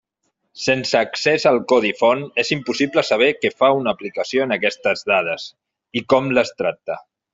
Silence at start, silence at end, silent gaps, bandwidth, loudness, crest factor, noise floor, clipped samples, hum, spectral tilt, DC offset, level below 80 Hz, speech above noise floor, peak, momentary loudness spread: 0.55 s; 0.3 s; none; 7.8 kHz; -19 LUFS; 18 dB; -72 dBFS; under 0.1%; none; -4.5 dB/octave; under 0.1%; -62 dBFS; 54 dB; -2 dBFS; 10 LU